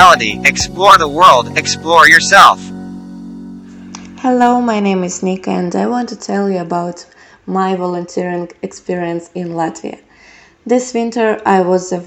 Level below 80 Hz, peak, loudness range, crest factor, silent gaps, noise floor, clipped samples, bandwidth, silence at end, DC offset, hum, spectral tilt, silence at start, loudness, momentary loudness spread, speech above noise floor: -44 dBFS; 0 dBFS; 11 LU; 12 dB; none; -43 dBFS; 2%; over 20 kHz; 0 s; under 0.1%; none; -3.5 dB/octave; 0 s; -12 LUFS; 24 LU; 31 dB